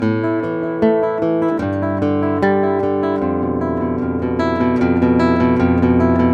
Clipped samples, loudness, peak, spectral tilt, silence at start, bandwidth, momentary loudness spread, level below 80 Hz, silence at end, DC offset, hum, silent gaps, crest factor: under 0.1%; -17 LUFS; -2 dBFS; -9 dB/octave; 0 s; 7.4 kHz; 5 LU; -44 dBFS; 0 s; under 0.1%; none; none; 14 dB